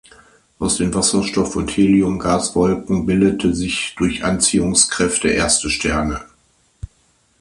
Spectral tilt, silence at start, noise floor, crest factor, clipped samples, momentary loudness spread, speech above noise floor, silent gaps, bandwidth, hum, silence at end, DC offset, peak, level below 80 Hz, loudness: -3.5 dB/octave; 0.6 s; -59 dBFS; 18 dB; under 0.1%; 6 LU; 42 dB; none; 11.5 kHz; none; 0.55 s; under 0.1%; 0 dBFS; -36 dBFS; -17 LUFS